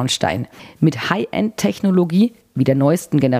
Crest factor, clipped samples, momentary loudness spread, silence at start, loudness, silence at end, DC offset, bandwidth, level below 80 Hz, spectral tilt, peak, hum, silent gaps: 16 dB; under 0.1%; 6 LU; 0 s; -18 LUFS; 0 s; under 0.1%; 15.5 kHz; -54 dBFS; -6 dB/octave; 0 dBFS; none; none